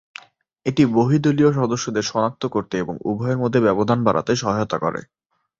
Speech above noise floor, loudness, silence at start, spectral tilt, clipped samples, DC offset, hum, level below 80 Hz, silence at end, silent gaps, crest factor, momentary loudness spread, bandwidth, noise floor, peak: 29 dB; -20 LUFS; 0.65 s; -6.5 dB/octave; under 0.1%; under 0.1%; none; -54 dBFS; 0.55 s; none; 18 dB; 9 LU; 7.8 kHz; -48 dBFS; -2 dBFS